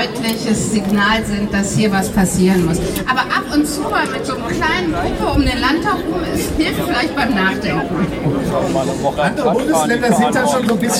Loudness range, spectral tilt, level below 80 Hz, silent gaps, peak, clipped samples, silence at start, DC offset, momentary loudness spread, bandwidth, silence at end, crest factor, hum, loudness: 2 LU; -4.5 dB/octave; -32 dBFS; none; -2 dBFS; under 0.1%; 0 s; under 0.1%; 5 LU; 16.5 kHz; 0 s; 14 dB; none; -16 LUFS